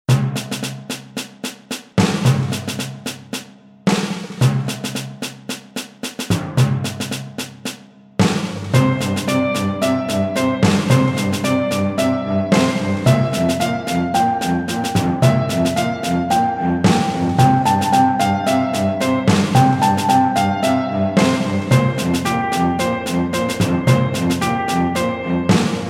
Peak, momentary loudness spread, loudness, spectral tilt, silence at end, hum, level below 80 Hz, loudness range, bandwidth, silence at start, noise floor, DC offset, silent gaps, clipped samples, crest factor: 0 dBFS; 12 LU; -18 LUFS; -5.5 dB/octave; 0 s; none; -46 dBFS; 6 LU; 16.5 kHz; 0.1 s; -38 dBFS; under 0.1%; none; under 0.1%; 16 dB